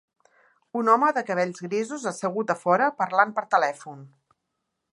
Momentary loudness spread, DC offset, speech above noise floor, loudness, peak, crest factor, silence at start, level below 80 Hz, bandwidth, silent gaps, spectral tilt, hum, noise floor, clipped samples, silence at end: 10 LU; under 0.1%; 56 dB; -24 LUFS; -4 dBFS; 22 dB; 0.75 s; -82 dBFS; 11.5 kHz; none; -5 dB/octave; none; -80 dBFS; under 0.1%; 0.85 s